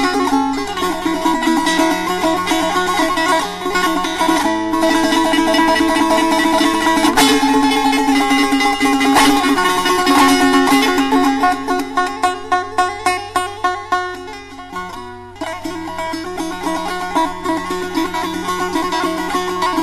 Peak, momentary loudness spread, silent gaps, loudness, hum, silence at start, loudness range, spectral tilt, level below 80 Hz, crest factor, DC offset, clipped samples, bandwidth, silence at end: -4 dBFS; 12 LU; none; -15 LUFS; none; 0 s; 9 LU; -3 dB/octave; -42 dBFS; 12 dB; under 0.1%; under 0.1%; 14 kHz; 0 s